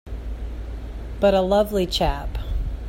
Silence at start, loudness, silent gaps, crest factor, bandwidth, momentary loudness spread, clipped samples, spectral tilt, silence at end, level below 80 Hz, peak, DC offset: 0.05 s; -22 LUFS; none; 18 dB; 16 kHz; 16 LU; under 0.1%; -6 dB/octave; 0 s; -30 dBFS; -6 dBFS; under 0.1%